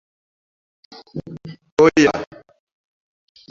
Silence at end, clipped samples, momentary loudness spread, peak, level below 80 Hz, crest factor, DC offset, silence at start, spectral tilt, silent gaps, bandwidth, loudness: 1.25 s; under 0.1%; 23 LU; -2 dBFS; -54 dBFS; 20 dB; under 0.1%; 1.15 s; -5 dB/octave; 1.71-1.77 s; 7.6 kHz; -16 LUFS